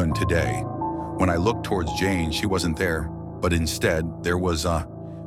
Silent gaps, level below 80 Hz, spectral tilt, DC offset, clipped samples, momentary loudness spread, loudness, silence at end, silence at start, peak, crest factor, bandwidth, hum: none; -40 dBFS; -5.5 dB/octave; under 0.1%; under 0.1%; 6 LU; -24 LUFS; 0 s; 0 s; -8 dBFS; 16 dB; 16 kHz; none